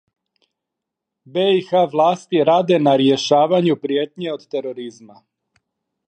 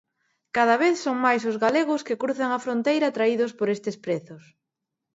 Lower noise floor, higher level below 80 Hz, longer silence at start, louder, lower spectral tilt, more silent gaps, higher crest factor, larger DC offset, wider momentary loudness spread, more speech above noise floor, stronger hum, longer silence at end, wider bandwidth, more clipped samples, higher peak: about the same, -82 dBFS vs -84 dBFS; about the same, -72 dBFS vs -74 dBFS; first, 1.35 s vs 0.55 s; first, -17 LUFS vs -24 LUFS; about the same, -6 dB/octave vs -5 dB/octave; neither; about the same, 16 dB vs 18 dB; neither; first, 12 LU vs 8 LU; first, 65 dB vs 60 dB; neither; first, 1.05 s vs 0.75 s; first, 9.2 kHz vs 8 kHz; neither; first, -2 dBFS vs -6 dBFS